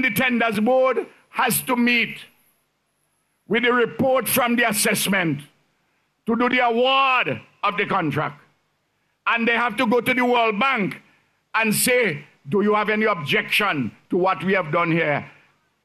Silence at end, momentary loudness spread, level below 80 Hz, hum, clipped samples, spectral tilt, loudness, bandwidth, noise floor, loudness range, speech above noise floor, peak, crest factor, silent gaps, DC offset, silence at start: 0.55 s; 8 LU; -64 dBFS; none; under 0.1%; -3.5 dB/octave; -20 LUFS; 14 kHz; -70 dBFS; 2 LU; 50 dB; -8 dBFS; 14 dB; none; under 0.1%; 0 s